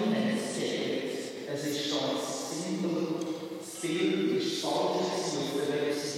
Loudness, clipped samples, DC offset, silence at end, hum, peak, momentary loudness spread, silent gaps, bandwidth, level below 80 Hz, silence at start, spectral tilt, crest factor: -31 LUFS; under 0.1%; under 0.1%; 0 s; none; -16 dBFS; 7 LU; none; 16 kHz; -90 dBFS; 0 s; -4 dB/octave; 14 dB